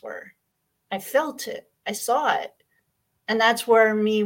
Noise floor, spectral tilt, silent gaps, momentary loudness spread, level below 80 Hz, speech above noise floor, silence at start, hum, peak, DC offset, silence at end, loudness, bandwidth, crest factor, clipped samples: -75 dBFS; -3.5 dB/octave; none; 20 LU; -76 dBFS; 53 dB; 0.05 s; none; -4 dBFS; under 0.1%; 0 s; -22 LUFS; 17 kHz; 20 dB; under 0.1%